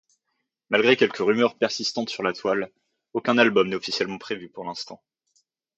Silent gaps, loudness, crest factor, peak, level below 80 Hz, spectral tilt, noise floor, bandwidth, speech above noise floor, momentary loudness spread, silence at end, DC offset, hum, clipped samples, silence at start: none; -23 LUFS; 22 dB; -4 dBFS; -70 dBFS; -4 dB/octave; -78 dBFS; 8.2 kHz; 55 dB; 15 LU; 0.8 s; under 0.1%; none; under 0.1%; 0.7 s